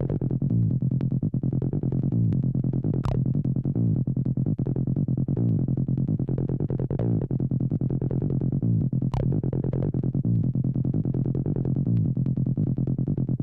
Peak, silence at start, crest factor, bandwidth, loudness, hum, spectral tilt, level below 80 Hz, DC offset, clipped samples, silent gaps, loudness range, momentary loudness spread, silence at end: -16 dBFS; 0 s; 10 dB; 2.9 kHz; -26 LUFS; none; -12.5 dB/octave; -42 dBFS; under 0.1%; under 0.1%; none; 1 LU; 2 LU; 0 s